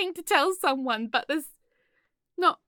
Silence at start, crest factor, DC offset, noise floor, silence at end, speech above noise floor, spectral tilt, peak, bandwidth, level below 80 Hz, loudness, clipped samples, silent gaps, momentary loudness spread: 0 s; 22 dB; under 0.1%; -74 dBFS; 0.15 s; 48 dB; -2 dB/octave; -6 dBFS; 17.5 kHz; -76 dBFS; -26 LUFS; under 0.1%; none; 12 LU